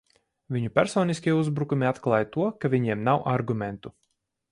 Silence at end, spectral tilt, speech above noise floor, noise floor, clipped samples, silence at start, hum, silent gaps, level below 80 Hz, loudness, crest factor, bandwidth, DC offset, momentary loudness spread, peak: 0.6 s; -7 dB/octave; 51 dB; -76 dBFS; under 0.1%; 0.5 s; none; none; -60 dBFS; -26 LUFS; 20 dB; 11.5 kHz; under 0.1%; 8 LU; -6 dBFS